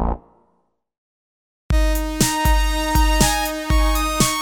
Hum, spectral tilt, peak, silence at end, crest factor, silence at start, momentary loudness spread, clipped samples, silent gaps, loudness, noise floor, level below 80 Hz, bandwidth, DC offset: 60 Hz at -40 dBFS; -3.5 dB/octave; -2 dBFS; 0 s; 18 dB; 0 s; 6 LU; under 0.1%; 0.98-1.69 s; -19 LUFS; -66 dBFS; -22 dBFS; 19 kHz; under 0.1%